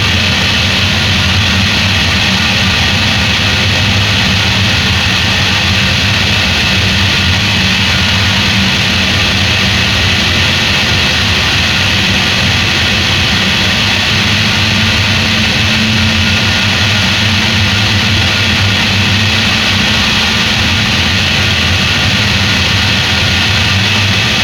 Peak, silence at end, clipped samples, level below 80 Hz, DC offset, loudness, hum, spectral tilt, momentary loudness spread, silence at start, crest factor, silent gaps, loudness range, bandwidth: 0 dBFS; 0 s; under 0.1%; -26 dBFS; under 0.1%; -9 LUFS; none; -3.5 dB/octave; 0 LU; 0 s; 10 dB; none; 0 LU; 18 kHz